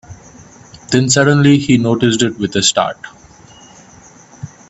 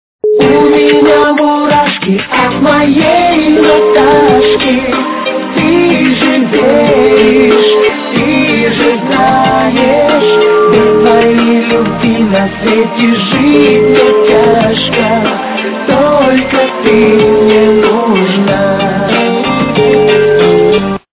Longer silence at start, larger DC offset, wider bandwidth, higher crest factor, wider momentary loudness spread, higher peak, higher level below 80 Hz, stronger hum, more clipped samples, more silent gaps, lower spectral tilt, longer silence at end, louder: second, 0.1 s vs 0.25 s; neither; first, 8.4 kHz vs 4 kHz; first, 16 dB vs 8 dB; first, 23 LU vs 5 LU; about the same, 0 dBFS vs 0 dBFS; second, -48 dBFS vs -38 dBFS; neither; second, under 0.1% vs 0.3%; neither; second, -4.5 dB/octave vs -9.5 dB/octave; about the same, 0.25 s vs 0.2 s; second, -13 LUFS vs -8 LUFS